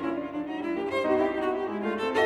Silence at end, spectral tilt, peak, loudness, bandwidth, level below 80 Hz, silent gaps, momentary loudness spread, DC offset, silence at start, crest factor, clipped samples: 0 s; -5.5 dB/octave; -12 dBFS; -29 LUFS; 12 kHz; -62 dBFS; none; 7 LU; under 0.1%; 0 s; 16 dB; under 0.1%